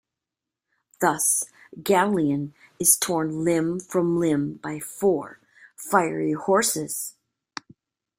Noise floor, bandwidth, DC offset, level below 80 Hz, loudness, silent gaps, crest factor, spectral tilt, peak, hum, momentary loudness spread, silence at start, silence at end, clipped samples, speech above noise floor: -87 dBFS; 16.5 kHz; under 0.1%; -64 dBFS; -23 LUFS; none; 22 dB; -4 dB/octave; -4 dBFS; none; 16 LU; 1 s; 1.1 s; under 0.1%; 64 dB